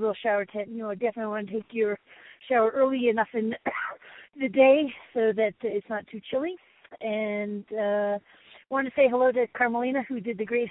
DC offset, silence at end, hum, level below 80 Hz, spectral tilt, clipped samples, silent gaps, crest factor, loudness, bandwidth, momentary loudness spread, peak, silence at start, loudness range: under 0.1%; 0 s; none; -72 dBFS; -9.5 dB/octave; under 0.1%; none; 20 dB; -27 LUFS; 4 kHz; 12 LU; -8 dBFS; 0 s; 5 LU